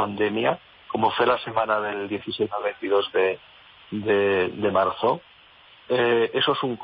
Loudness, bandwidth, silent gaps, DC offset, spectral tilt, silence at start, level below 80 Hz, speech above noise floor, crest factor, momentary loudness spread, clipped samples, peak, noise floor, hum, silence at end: -24 LUFS; 5.2 kHz; none; under 0.1%; -9.5 dB/octave; 0 s; -64 dBFS; 29 dB; 16 dB; 9 LU; under 0.1%; -8 dBFS; -52 dBFS; none; 0.05 s